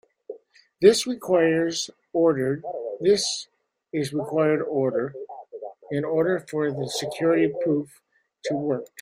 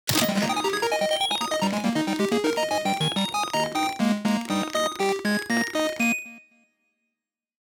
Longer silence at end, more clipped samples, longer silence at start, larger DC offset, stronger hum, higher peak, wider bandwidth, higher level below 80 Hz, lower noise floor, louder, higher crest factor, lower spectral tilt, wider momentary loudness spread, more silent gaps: second, 0.15 s vs 1.3 s; neither; first, 0.3 s vs 0.05 s; neither; neither; about the same, -4 dBFS vs -6 dBFS; second, 16 kHz vs over 20 kHz; about the same, -66 dBFS vs -64 dBFS; second, -44 dBFS vs -85 dBFS; about the same, -24 LUFS vs -24 LUFS; about the same, 20 dB vs 18 dB; about the same, -4.5 dB/octave vs -3.5 dB/octave; first, 19 LU vs 3 LU; neither